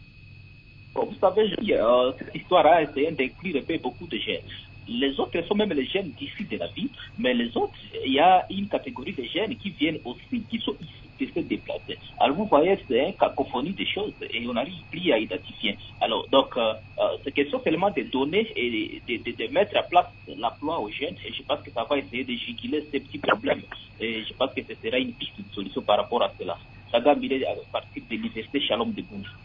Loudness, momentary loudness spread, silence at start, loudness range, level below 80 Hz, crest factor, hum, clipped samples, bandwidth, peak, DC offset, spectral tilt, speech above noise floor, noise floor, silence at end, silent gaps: -26 LUFS; 12 LU; 0 s; 5 LU; -54 dBFS; 20 dB; none; under 0.1%; 5.4 kHz; -6 dBFS; under 0.1%; -8 dB/octave; 22 dB; -48 dBFS; 0 s; none